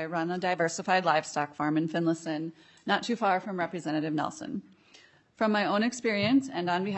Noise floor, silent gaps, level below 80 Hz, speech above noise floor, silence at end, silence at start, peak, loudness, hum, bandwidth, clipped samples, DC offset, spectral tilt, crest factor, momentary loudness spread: -59 dBFS; none; -76 dBFS; 30 dB; 0 s; 0 s; -10 dBFS; -29 LUFS; none; 8.4 kHz; under 0.1%; under 0.1%; -5 dB/octave; 18 dB; 9 LU